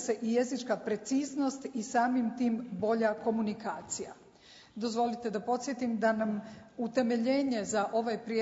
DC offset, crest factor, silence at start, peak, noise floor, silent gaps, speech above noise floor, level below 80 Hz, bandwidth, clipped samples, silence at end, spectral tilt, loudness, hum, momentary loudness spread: under 0.1%; 16 dB; 0 s; -16 dBFS; -57 dBFS; none; 25 dB; -72 dBFS; 8 kHz; under 0.1%; 0 s; -4.5 dB/octave; -32 LUFS; none; 9 LU